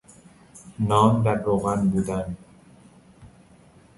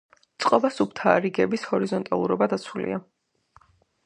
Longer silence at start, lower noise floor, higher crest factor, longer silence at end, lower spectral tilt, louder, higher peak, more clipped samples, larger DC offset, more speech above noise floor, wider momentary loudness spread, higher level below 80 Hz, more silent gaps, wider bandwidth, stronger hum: first, 0.55 s vs 0.4 s; second, -53 dBFS vs -60 dBFS; about the same, 20 dB vs 24 dB; second, 0.7 s vs 1.05 s; first, -7.5 dB/octave vs -6 dB/octave; about the same, -23 LUFS vs -24 LUFS; about the same, -4 dBFS vs -2 dBFS; neither; neither; second, 31 dB vs 36 dB; first, 17 LU vs 9 LU; first, -48 dBFS vs -66 dBFS; neither; about the same, 11.5 kHz vs 10.5 kHz; neither